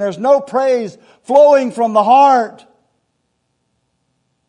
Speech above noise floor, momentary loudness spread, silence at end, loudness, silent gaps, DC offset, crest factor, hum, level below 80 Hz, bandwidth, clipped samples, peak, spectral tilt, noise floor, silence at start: 55 dB; 9 LU; 1.95 s; -12 LUFS; none; under 0.1%; 14 dB; none; -72 dBFS; 10.5 kHz; under 0.1%; 0 dBFS; -5.5 dB/octave; -67 dBFS; 0 s